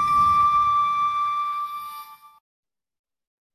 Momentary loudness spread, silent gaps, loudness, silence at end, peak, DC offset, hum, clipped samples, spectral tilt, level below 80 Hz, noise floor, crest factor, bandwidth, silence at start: 17 LU; none; -21 LUFS; 1.4 s; -12 dBFS; under 0.1%; none; under 0.1%; -3 dB/octave; -52 dBFS; -42 dBFS; 12 dB; 14 kHz; 0 s